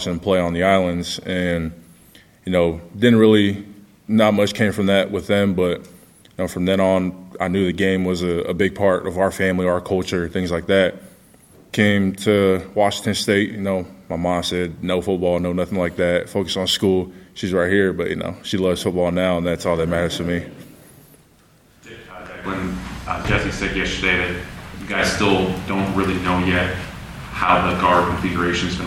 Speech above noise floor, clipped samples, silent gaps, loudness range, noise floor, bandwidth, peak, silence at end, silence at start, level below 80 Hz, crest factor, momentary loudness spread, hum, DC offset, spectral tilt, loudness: 34 dB; under 0.1%; none; 5 LU; -53 dBFS; 15.5 kHz; 0 dBFS; 0 s; 0 s; -42 dBFS; 20 dB; 11 LU; none; under 0.1%; -5.5 dB/octave; -20 LUFS